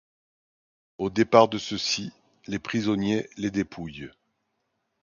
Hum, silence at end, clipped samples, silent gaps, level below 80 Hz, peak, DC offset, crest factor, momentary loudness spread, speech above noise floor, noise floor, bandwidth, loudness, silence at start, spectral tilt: none; 0.95 s; under 0.1%; none; -58 dBFS; -2 dBFS; under 0.1%; 24 dB; 19 LU; 52 dB; -77 dBFS; 7.4 kHz; -25 LUFS; 1 s; -5 dB/octave